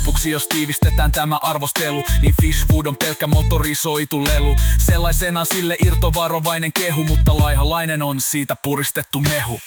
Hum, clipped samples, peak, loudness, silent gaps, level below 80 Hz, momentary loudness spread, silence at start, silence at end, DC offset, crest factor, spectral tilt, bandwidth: none; under 0.1%; -4 dBFS; -18 LUFS; none; -20 dBFS; 4 LU; 0 s; 0 s; under 0.1%; 12 dB; -4.5 dB/octave; 19.5 kHz